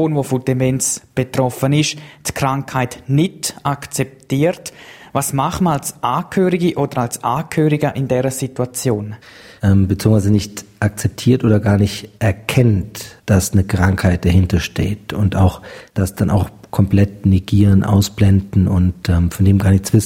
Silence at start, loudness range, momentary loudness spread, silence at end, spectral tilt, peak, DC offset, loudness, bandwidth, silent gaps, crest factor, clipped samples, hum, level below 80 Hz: 0 s; 4 LU; 8 LU; 0 s; -6 dB/octave; 0 dBFS; under 0.1%; -17 LUFS; 16.5 kHz; none; 16 dB; under 0.1%; none; -36 dBFS